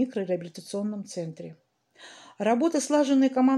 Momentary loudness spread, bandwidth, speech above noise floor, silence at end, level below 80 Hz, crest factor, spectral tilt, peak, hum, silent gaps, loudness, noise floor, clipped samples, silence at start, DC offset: 22 LU; 12 kHz; 27 dB; 0 s; -82 dBFS; 16 dB; -5 dB/octave; -10 dBFS; none; none; -26 LUFS; -52 dBFS; under 0.1%; 0 s; under 0.1%